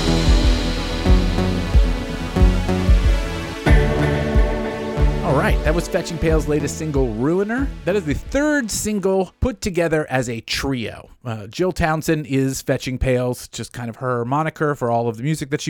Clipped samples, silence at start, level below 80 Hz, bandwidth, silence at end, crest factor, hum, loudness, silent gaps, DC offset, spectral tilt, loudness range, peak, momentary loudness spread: under 0.1%; 0 s; -22 dBFS; 17.5 kHz; 0 s; 14 dB; none; -20 LUFS; none; under 0.1%; -5.5 dB/octave; 3 LU; -4 dBFS; 7 LU